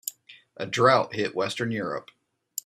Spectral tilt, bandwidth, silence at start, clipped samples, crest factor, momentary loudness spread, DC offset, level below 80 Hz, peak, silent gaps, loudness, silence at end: -4 dB/octave; 15.5 kHz; 0.05 s; under 0.1%; 24 dB; 16 LU; under 0.1%; -68 dBFS; -4 dBFS; none; -25 LUFS; 0.05 s